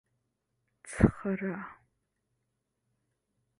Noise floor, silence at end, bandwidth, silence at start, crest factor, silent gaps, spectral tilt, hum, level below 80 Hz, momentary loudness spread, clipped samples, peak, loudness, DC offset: -82 dBFS; 1.85 s; 11 kHz; 0.85 s; 28 dB; none; -8 dB/octave; 50 Hz at -55 dBFS; -48 dBFS; 17 LU; under 0.1%; -8 dBFS; -30 LUFS; under 0.1%